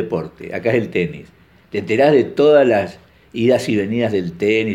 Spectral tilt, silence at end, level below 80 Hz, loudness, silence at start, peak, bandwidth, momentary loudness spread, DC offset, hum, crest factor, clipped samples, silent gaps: -6.5 dB/octave; 0 s; -54 dBFS; -17 LUFS; 0 s; -2 dBFS; 12.5 kHz; 14 LU; under 0.1%; none; 16 dB; under 0.1%; none